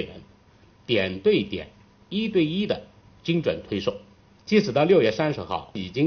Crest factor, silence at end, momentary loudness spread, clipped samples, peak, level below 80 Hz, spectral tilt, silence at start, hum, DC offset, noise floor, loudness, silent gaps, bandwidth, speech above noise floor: 18 dB; 0 s; 16 LU; under 0.1%; -6 dBFS; -56 dBFS; -4.5 dB/octave; 0 s; none; under 0.1%; -55 dBFS; -24 LUFS; none; 6.6 kHz; 32 dB